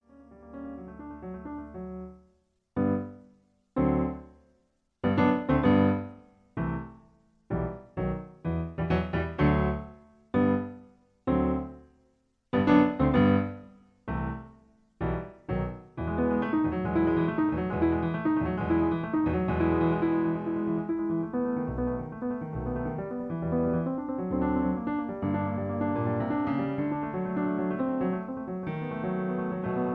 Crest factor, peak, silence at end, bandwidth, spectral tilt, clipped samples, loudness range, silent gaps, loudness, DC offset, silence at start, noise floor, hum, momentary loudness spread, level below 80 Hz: 20 dB; -10 dBFS; 0 s; 5.4 kHz; -10.5 dB/octave; under 0.1%; 6 LU; none; -29 LUFS; under 0.1%; 0.2 s; -71 dBFS; none; 15 LU; -44 dBFS